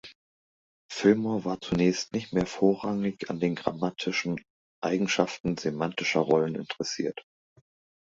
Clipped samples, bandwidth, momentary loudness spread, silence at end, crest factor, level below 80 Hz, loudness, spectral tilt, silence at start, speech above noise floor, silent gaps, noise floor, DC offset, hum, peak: under 0.1%; 8 kHz; 9 LU; 0.8 s; 22 dB; -60 dBFS; -28 LUFS; -5 dB/octave; 0.05 s; over 63 dB; 0.15-0.89 s, 4.50-4.82 s, 5.40-5.44 s; under -90 dBFS; under 0.1%; none; -6 dBFS